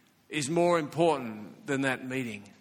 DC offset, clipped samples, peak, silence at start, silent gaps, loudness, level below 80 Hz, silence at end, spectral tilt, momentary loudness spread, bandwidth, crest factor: under 0.1%; under 0.1%; -12 dBFS; 0.3 s; none; -29 LUFS; -70 dBFS; 0.1 s; -5 dB/octave; 12 LU; 16 kHz; 18 dB